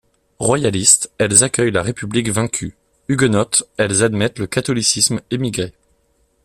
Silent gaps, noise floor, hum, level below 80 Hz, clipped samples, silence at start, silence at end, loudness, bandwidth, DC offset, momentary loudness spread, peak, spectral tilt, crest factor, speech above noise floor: none; -61 dBFS; none; -48 dBFS; under 0.1%; 0.4 s; 0.75 s; -16 LUFS; 15 kHz; under 0.1%; 10 LU; 0 dBFS; -3.5 dB/octave; 18 dB; 44 dB